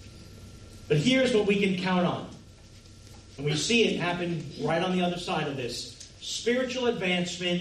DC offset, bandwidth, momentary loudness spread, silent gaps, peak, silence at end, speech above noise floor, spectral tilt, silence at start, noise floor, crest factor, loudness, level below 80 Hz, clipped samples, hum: under 0.1%; 13 kHz; 23 LU; none; -12 dBFS; 0 s; 23 dB; -4.5 dB/octave; 0 s; -50 dBFS; 16 dB; -27 LUFS; -56 dBFS; under 0.1%; none